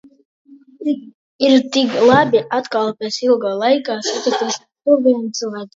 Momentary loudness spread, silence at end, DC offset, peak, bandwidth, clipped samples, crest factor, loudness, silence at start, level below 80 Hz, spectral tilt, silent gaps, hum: 10 LU; 0.1 s; under 0.1%; 0 dBFS; 7.8 kHz; under 0.1%; 16 dB; -17 LUFS; 0.5 s; -60 dBFS; -4 dB/octave; 1.14-1.39 s; none